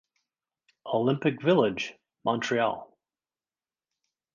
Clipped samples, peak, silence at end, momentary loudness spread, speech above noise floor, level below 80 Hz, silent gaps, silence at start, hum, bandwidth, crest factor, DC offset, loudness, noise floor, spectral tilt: under 0.1%; -10 dBFS; 1.5 s; 12 LU; over 64 dB; -70 dBFS; none; 0.85 s; none; 7.4 kHz; 20 dB; under 0.1%; -27 LUFS; under -90 dBFS; -6 dB/octave